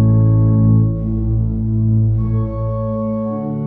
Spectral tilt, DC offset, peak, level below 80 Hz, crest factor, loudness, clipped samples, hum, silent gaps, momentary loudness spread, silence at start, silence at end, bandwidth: -14.5 dB/octave; under 0.1%; -4 dBFS; -26 dBFS; 10 dB; -16 LUFS; under 0.1%; none; none; 8 LU; 0 s; 0 s; 2.2 kHz